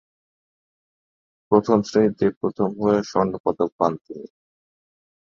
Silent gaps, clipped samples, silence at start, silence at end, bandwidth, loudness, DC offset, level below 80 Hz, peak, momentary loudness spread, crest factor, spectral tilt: 2.36-2.41 s, 3.40-3.44 s, 3.72-3.79 s, 4.01-4.05 s; under 0.1%; 1.5 s; 1.15 s; 7.4 kHz; -21 LUFS; under 0.1%; -58 dBFS; -2 dBFS; 7 LU; 22 dB; -7 dB/octave